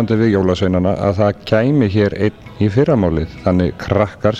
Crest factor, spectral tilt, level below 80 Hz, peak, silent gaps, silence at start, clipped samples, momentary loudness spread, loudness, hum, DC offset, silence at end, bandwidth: 14 dB; -8.5 dB/octave; -36 dBFS; 0 dBFS; none; 0 s; under 0.1%; 5 LU; -16 LUFS; none; under 0.1%; 0 s; 8 kHz